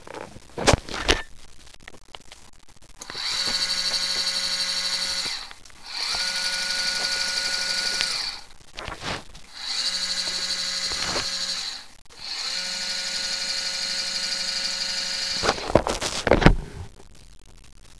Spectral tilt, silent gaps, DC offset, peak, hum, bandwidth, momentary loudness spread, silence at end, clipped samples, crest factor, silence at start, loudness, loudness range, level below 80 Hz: -2.5 dB/octave; none; 0.4%; 0 dBFS; none; 11 kHz; 17 LU; 0 s; under 0.1%; 26 dB; 0 s; -24 LUFS; 3 LU; -38 dBFS